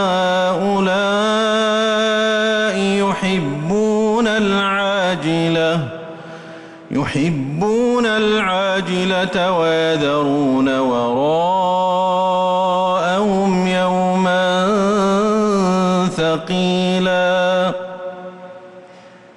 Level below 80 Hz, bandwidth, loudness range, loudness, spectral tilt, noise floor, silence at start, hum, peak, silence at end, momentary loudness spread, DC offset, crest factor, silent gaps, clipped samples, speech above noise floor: -52 dBFS; 11.5 kHz; 3 LU; -16 LUFS; -5.5 dB/octave; -42 dBFS; 0 s; none; -8 dBFS; 0.25 s; 6 LU; under 0.1%; 8 dB; none; under 0.1%; 26 dB